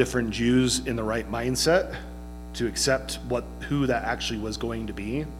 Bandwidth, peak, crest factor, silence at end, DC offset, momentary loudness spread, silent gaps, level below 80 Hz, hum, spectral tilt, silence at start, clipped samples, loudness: 16 kHz; -8 dBFS; 18 dB; 0 s; under 0.1%; 10 LU; none; -40 dBFS; 60 Hz at -40 dBFS; -4 dB/octave; 0 s; under 0.1%; -26 LUFS